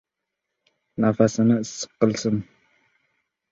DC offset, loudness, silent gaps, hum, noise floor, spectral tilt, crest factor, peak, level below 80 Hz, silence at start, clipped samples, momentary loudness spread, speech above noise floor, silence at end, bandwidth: under 0.1%; -22 LUFS; none; none; -82 dBFS; -6 dB/octave; 22 dB; -2 dBFS; -60 dBFS; 1 s; under 0.1%; 11 LU; 61 dB; 1.1 s; 8 kHz